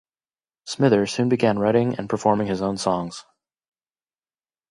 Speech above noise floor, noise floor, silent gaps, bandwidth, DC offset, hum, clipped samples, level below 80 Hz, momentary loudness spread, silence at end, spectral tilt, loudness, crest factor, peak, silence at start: over 69 dB; under -90 dBFS; none; 11.5 kHz; under 0.1%; none; under 0.1%; -58 dBFS; 15 LU; 1.5 s; -6 dB/octave; -21 LUFS; 20 dB; -4 dBFS; 0.65 s